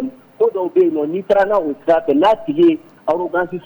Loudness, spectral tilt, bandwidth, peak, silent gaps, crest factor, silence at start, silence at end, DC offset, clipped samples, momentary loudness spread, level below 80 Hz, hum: -16 LUFS; -7.5 dB/octave; over 20 kHz; -4 dBFS; none; 12 dB; 0 s; 0.05 s; under 0.1%; under 0.1%; 7 LU; -54 dBFS; none